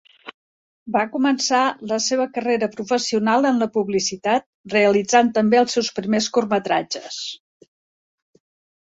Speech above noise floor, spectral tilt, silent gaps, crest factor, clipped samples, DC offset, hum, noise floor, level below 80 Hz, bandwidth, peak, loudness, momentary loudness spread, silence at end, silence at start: over 70 dB; -3.5 dB/octave; 0.34-0.86 s, 4.46-4.64 s; 18 dB; under 0.1%; under 0.1%; none; under -90 dBFS; -64 dBFS; 8 kHz; -2 dBFS; -20 LUFS; 7 LU; 1.45 s; 0.25 s